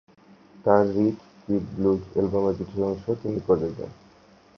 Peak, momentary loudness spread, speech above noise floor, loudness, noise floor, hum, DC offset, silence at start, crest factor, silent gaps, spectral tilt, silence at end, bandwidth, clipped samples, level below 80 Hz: -4 dBFS; 10 LU; 31 dB; -25 LUFS; -54 dBFS; none; under 0.1%; 0.6 s; 22 dB; none; -9.5 dB/octave; 0.65 s; 6.6 kHz; under 0.1%; -52 dBFS